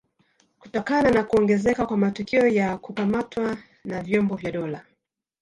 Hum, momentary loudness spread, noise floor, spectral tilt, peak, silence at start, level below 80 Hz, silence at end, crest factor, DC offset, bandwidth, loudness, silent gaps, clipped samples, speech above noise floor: none; 13 LU; -74 dBFS; -7 dB/octave; -8 dBFS; 0.65 s; -52 dBFS; 0.6 s; 16 dB; under 0.1%; 10.5 kHz; -23 LUFS; none; under 0.1%; 51 dB